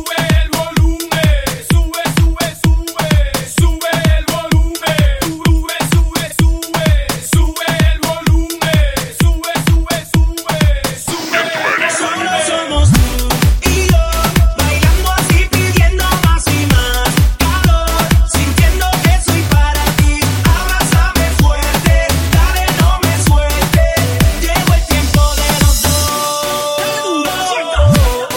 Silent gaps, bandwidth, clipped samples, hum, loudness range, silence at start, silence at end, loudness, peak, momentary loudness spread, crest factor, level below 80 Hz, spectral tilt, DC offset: none; 17 kHz; under 0.1%; none; 2 LU; 0 s; 0 s; -13 LUFS; 0 dBFS; 4 LU; 12 dB; -16 dBFS; -4.5 dB/octave; under 0.1%